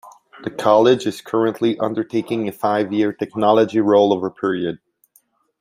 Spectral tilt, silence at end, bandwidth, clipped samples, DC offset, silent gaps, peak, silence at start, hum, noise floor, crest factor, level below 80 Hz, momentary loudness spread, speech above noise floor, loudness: -6.5 dB/octave; 0.85 s; 16 kHz; under 0.1%; under 0.1%; none; -2 dBFS; 0.05 s; none; -60 dBFS; 16 dB; -64 dBFS; 10 LU; 42 dB; -18 LUFS